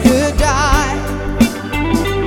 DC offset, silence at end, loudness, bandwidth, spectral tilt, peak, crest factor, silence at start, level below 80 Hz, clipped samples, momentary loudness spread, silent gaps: under 0.1%; 0 s; -15 LUFS; 17.5 kHz; -5 dB/octave; 0 dBFS; 14 dB; 0 s; -22 dBFS; under 0.1%; 7 LU; none